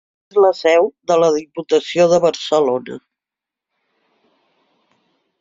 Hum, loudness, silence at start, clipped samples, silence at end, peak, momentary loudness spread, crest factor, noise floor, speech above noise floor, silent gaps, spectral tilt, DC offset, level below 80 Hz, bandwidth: none; -16 LUFS; 0.35 s; under 0.1%; 2.45 s; -2 dBFS; 9 LU; 16 dB; -86 dBFS; 71 dB; none; -4.5 dB/octave; under 0.1%; -64 dBFS; 7.6 kHz